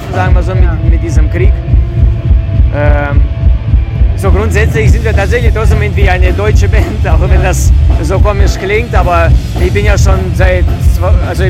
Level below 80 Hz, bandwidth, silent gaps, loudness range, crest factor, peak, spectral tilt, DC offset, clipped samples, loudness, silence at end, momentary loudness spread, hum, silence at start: -10 dBFS; 13.5 kHz; none; 1 LU; 8 dB; 0 dBFS; -6.5 dB/octave; under 0.1%; 4%; -10 LUFS; 0 s; 3 LU; none; 0 s